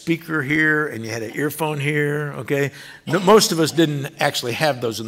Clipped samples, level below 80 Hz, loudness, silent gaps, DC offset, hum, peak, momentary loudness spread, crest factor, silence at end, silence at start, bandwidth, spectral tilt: under 0.1%; -60 dBFS; -20 LUFS; none; under 0.1%; none; -4 dBFS; 11 LU; 16 dB; 0 s; 0 s; 16 kHz; -4.5 dB/octave